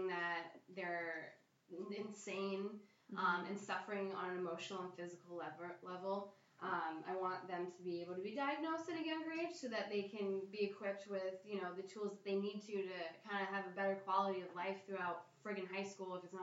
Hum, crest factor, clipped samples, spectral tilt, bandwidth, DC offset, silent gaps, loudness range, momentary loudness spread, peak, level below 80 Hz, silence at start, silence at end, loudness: none; 20 dB; under 0.1%; -5 dB/octave; 8 kHz; under 0.1%; none; 3 LU; 9 LU; -24 dBFS; under -90 dBFS; 0 s; 0 s; -44 LUFS